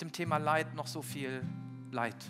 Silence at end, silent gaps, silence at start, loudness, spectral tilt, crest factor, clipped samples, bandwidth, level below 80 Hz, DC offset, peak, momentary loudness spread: 0 s; none; 0 s; -36 LUFS; -5 dB/octave; 20 dB; under 0.1%; 16 kHz; -84 dBFS; under 0.1%; -16 dBFS; 11 LU